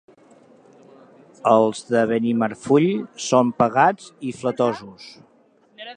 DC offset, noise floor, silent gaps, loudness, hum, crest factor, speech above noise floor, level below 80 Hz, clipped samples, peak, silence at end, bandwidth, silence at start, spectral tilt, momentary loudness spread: under 0.1%; -57 dBFS; none; -20 LUFS; none; 20 dB; 37 dB; -66 dBFS; under 0.1%; -2 dBFS; 0.05 s; 9.8 kHz; 1.45 s; -5.5 dB/octave; 15 LU